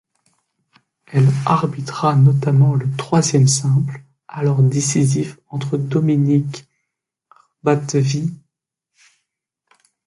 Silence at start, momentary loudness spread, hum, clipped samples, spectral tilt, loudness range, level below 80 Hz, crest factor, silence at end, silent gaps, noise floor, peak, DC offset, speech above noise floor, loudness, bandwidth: 1.1 s; 12 LU; none; under 0.1%; -6 dB/octave; 7 LU; -58 dBFS; 16 dB; 1.7 s; none; -79 dBFS; -2 dBFS; under 0.1%; 63 dB; -17 LUFS; 11.5 kHz